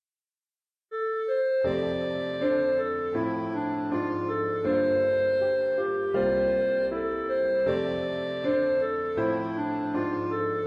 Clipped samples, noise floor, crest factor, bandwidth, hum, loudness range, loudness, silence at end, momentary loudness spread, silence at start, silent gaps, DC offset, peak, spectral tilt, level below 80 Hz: under 0.1%; under -90 dBFS; 14 dB; 5.6 kHz; none; 2 LU; -27 LUFS; 0 s; 6 LU; 0.9 s; none; under 0.1%; -14 dBFS; -8 dB/octave; -56 dBFS